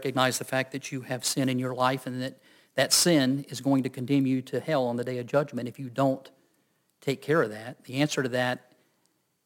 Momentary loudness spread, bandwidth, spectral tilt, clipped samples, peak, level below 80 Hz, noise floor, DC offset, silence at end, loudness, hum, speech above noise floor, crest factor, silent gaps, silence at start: 13 LU; 17 kHz; -4 dB/octave; under 0.1%; -8 dBFS; -72 dBFS; -72 dBFS; under 0.1%; 0.9 s; -27 LUFS; none; 45 dB; 20 dB; none; 0 s